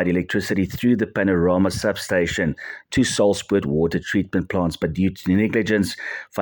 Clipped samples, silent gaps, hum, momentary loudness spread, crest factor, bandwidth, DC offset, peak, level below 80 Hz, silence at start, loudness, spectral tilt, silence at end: under 0.1%; none; none; 6 LU; 16 dB; 17.5 kHz; under 0.1%; -6 dBFS; -48 dBFS; 0 s; -21 LUFS; -5.5 dB/octave; 0 s